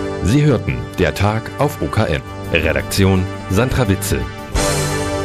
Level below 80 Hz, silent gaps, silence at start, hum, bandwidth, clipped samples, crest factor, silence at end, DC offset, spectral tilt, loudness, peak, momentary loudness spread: -30 dBFS; none; 0 s; none; 15.5 kHz; under 0.1%; 16 dB; 0 s; under 0.1%; -5.5 dB/octave; -17 LUFS; 0 dBFS; 5 LU